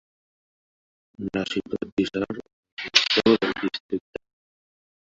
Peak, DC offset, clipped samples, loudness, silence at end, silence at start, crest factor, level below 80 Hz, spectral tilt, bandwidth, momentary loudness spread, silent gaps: -2 dBFS; under 0.1%; under 0.1%; -24 LUFS; 1.15 s; 1.2 s; 26 dB; -58 dBFS; -3.5 dB/octave; 8 kHz; 18 LU; 1.92-1.97 s, 2.53-2.63 s, 2.72-2.77 s, 3.80-3.89 s